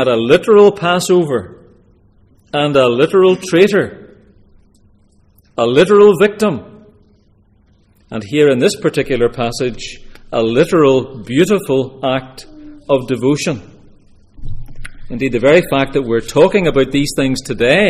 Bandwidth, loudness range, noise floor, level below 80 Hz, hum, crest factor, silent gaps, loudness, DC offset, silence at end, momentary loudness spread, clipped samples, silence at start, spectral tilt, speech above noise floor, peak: 15 kHz; 4 LU; -51 dBFS; -36 dBFS; none; 14 dB; none; -13 LUFS; under 0.1%; 0 s; 17 LU; under 0.1%; 0 s; -5.5 dB/octave; 39 dB; 0 dBFS